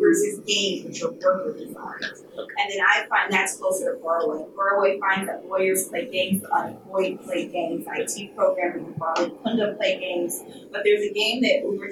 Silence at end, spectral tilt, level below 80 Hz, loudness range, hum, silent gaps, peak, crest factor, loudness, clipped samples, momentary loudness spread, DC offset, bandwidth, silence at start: 0 s; -3 dB/octave; -72 dBFS; 3 LU; none; none; -6 dBFS; 18 dB; -24 LUFS; under 0.1%; 10 LU; under 0.1%; 16.5 kHz; 0 s